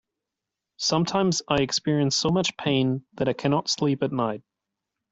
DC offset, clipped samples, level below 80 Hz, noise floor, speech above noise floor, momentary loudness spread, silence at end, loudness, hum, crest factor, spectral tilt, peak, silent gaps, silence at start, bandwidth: under 0.1%; under 0.1%; -58 dBFS; -86 dBFS; 62 dB; 5 LU; 0.7 s; -24 LUFS; none; 18 dB; -4.5 dB/octave; -8 dBFS; none; 0.8 s; 8 kHz